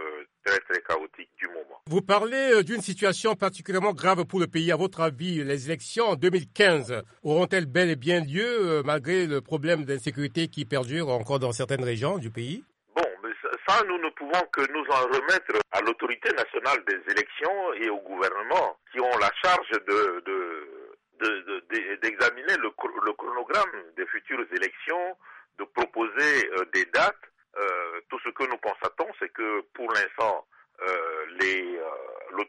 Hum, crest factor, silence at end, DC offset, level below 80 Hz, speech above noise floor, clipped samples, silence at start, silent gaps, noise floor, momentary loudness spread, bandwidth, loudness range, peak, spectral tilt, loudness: none; 22 dB; 0 s; under 0.1%; -68 dBFS; 21 dB; under 0.1%; 0 s; none; -48 dBFS; 11 LU; 11.5 kHz; 4 LU; -6 dBFS; -4.5 dB/octave; -26 LUFS